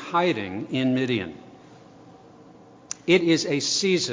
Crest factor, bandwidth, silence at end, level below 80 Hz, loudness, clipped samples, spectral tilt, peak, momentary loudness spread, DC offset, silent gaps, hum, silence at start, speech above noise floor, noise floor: 20 dB; 7.6 kHz; 0 s; -62 dBFS; -23 LUFS; under 0.1%; -4 dB/octave; -4 dBFS; 15 LU; under 0.1%; none; none; 0 s; 26 dB; -49 dBFS